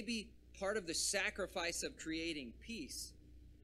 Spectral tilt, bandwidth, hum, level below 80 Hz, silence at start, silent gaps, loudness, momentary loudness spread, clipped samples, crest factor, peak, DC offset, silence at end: -2 dB/octave; 15.5 kHz; none; -60 dBFS; 0 s; none; -41 LUFS; 12 LU; under 0.1%; 20 dB; -22 dBFS; under 0.1%; 0 s